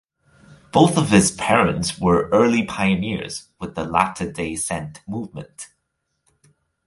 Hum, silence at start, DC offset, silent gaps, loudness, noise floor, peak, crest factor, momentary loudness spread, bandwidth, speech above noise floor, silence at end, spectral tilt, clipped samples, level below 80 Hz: none; 0.75 s; under 0.1%; none; -20 LUFS; -75 dBFS; 0 dBFS; 20 dB; 16 LU; 11.5 kHz; 55 dB; 1.2 s; -5 dB/octave; under 0.1%; -46 dBFS